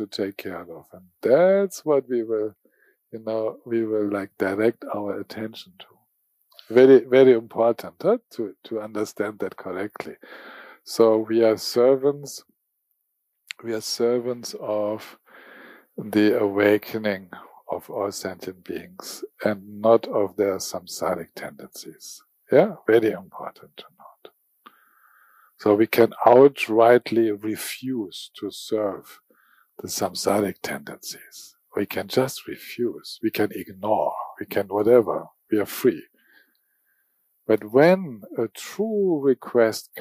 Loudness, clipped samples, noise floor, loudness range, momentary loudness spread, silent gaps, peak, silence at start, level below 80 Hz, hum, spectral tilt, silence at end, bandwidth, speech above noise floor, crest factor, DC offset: -22 LUFS; under 0.1%; -76 dBFS; 8 LU; 20 LU; none; -4 dBFS; 0 s; -72 dBFS; none; -5 dB/octave; 0 s; 15.5 kHz; 53 dB; 20 dB; under 0.1%